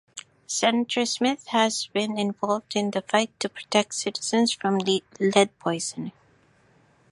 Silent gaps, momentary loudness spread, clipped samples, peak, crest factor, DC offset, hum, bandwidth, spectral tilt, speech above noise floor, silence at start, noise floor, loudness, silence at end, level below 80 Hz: none; 8 LU; under 0.1%; -2 dBFS; 22 dB; under 0.1%; none; 11.5 kHz; -3.5 dB/octave; 36 dB; 0.15 s; -60 dBFS; -25 LUFS; 1 s; -72 dBFS